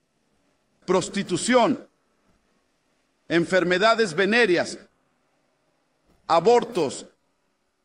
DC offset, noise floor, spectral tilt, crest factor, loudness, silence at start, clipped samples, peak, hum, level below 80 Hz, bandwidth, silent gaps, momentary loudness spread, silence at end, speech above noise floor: under 0.1%; -72 dBFS; -4 dB/octave; 18 dB; -22 LUFS; 0.9 s; under 0.1%; -8 dBFS; none; -66 dBFS; 10.5 kHz; none; 13 LU; 0.8 s; 51 dB